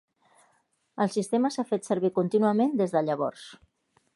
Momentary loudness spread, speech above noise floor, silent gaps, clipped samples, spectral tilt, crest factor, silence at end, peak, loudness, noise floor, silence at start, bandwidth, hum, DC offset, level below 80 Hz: 11 LU; 44 dB; none; under 0.1%; -6.5 dB/octave; 16 dB; 0.6 s; -10 dBFS; -27 LUFS; -70 dBFS; 0.95 s; 11.5 kHz; none; under 0.1%; -76 dBFS